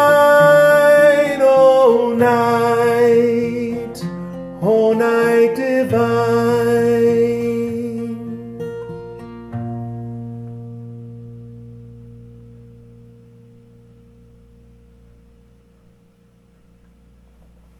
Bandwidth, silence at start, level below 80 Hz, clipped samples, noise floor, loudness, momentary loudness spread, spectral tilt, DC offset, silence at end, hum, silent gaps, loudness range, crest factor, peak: 14 kHz; 0 s; -52 dBFS; under 0.1%; -52 dBFS; -14 LUFS; 22 LU; -6 dB/octave; under 0.1%; 5.7 s; none; none; 20 LU; 14 dB; -2 dBFS